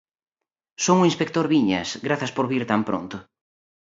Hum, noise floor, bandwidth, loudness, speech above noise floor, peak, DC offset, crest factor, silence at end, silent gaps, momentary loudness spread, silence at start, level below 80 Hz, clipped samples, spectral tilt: none; -87 dBFS; 7.8 kHz; -22 LUFS; 65 dB; -4 dBFS; under 0.1%; 20 dB; 0.75 s; none; 10 LU; 0.8 s; -60 dBFS; under 0.1%; -5 dB/octave